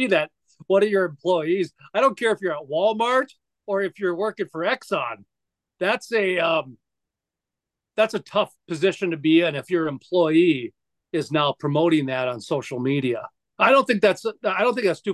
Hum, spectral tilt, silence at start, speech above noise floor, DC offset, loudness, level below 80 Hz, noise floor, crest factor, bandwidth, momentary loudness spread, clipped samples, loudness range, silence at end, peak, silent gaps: none; -5.5 dB/octave; 0 s; 65 dB; under 0.1%; -22 LUFS; -74 dBFS; -87 dBFS; 18 dB; 12.5 kHz; 9 LU; under 0.1%; 4 LU; 0 s; -4 dBFS; none